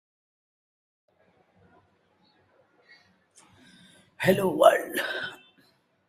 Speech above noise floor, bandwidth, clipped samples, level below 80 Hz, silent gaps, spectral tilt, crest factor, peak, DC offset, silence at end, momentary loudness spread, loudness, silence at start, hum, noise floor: 44 dB; 16 kHz; under 0.1%; -68 dBFS; none; -5 dB/octave; 26 dB; -4 dBFS; under 0.1%; 0.75 s; 14 LU; -24 LUFS; 4.2 s; none; -66 dBFS